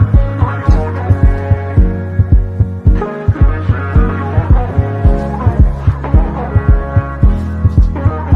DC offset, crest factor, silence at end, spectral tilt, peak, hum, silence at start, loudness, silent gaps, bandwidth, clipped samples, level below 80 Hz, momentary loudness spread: under 0.1%; 10 dB; 0 s; -10 dB/octave; 0 dBFS; none; 0 s; -13 LUFS; none; 4.4 kHz; under 0.1%; -14 dBFS; 3 LU